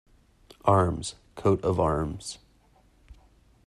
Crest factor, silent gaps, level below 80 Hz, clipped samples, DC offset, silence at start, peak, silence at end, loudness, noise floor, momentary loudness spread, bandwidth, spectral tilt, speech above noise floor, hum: 22 dB; none; -48 dBFS; under 0.1%; under 0.1%; 0.65 s; -6 dBFS; 0.55 s; -27 LUFS; -61 dBFS; 15 LU; 12 kHz; -6.5 dB/octave; 36 dB; none